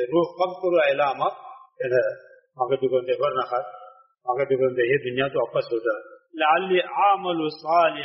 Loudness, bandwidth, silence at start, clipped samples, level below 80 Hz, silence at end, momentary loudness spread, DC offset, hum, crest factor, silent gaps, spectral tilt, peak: -23 LUFS; 5.8 kHz; 0 s; under 0.1%; -70 dBFS; 0 s; 9 LU; under 0.1%; none; 18 dB; none; -3 dB/octave; -6 dBFS